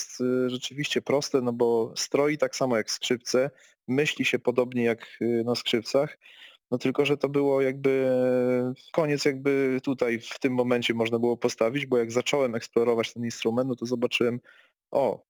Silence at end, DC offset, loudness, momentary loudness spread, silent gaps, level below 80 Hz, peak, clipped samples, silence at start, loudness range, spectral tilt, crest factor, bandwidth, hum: 0.15 s; under 0.1%; -26 LUFS; 4 LU; none; -72 dBFS; -10 dBFS; under 0.1%; 0 s; 2 LU; -4.5 dB/octave; 16 dB; 19.5 kHz; none